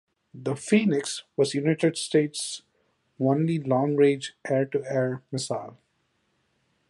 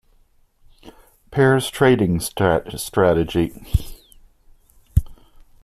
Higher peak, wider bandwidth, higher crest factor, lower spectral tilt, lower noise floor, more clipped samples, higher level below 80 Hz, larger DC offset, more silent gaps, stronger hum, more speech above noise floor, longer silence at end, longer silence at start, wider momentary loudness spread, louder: second, -8 dBFS vs -2 dBFS; second, 11.5 kHz vs 14.5 kHz; about the same, 20 dB vs 18 dB; about the same, -5.5 dB/octave vs -6 dB/octave; first, -72 dBFS vs -56 dBFS; neither; second, -72 dBFS vs -34 dBFS; neither; neither; neither; first, 47 dB vs 38 dB; first, 1.15 s vs 0.5 s; second, 0.35 s vs 0.85 s; about the same, 10 LU vs 9 LU; second, -26 LUFS vs -20 LUFS